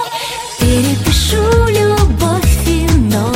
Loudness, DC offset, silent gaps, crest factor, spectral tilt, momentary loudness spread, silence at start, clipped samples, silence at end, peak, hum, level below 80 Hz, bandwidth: -13 LUFS; under 0.1%; none; 12 dB; -5 dB/octave; 5 LU; 0 s; under 0.1%; 0 s; 0 dBFS; none; -18 dBFS; 16.5 kHz